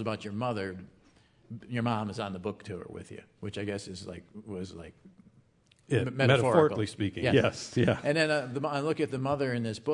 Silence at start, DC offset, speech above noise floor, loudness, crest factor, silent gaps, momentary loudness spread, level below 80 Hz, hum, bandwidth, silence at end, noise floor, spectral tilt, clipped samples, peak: 0 s; under 0.1%; 34 dB; -30 LUFS; 24 dB; none; 19 LU; -66 dBFS; none; 11 kHz; 0 s; -64 dBFS; -6 dB/octave; under 0.1%; -8 dBFS